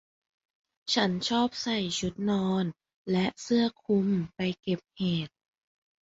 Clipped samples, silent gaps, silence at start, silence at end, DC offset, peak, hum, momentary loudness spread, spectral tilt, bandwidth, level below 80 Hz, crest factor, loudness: under 0.1%; 2.96-3.05 s; 0.85 s; 0.75 s; under 0.1%; -12 dBFS; none; 7 LU; -5 dB/octave; 8 kHz; -62 dBFS; 18 dB; -29 LUFS